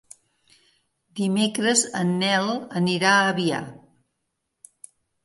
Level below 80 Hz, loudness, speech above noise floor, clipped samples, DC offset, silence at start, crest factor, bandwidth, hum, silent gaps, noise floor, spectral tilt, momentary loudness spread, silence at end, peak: -70 dBFS; -22 LUFS; 56 dB; under 0.1%; under 0.1%; 1.15 s; 18 dB; 11.5 kHz; none; none; -78 dBFS; -3.5 dB/octave; 11 LU; 1.5 s; -6 dBFS